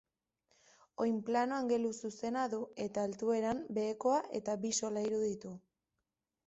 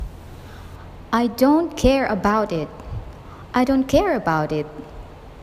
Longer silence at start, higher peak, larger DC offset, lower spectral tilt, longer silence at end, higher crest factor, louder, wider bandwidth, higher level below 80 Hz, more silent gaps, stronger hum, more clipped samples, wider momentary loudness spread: first, 1 s vs 0 s; second, -20 dBFS vs -2 dBFS; neither; second, -4.5 dB/octave vs -6 dB/octave; first, 0.9 s vs 0 s; about the same, 16 dB vs 20 dB; second, -36 LUFS vs -20 LUFS; second, 8 kHz vs 15.5 kHz; second, -74 dBFS vs -36 dBFS; neither; neither; neither; second, 6 LU vs 22 LU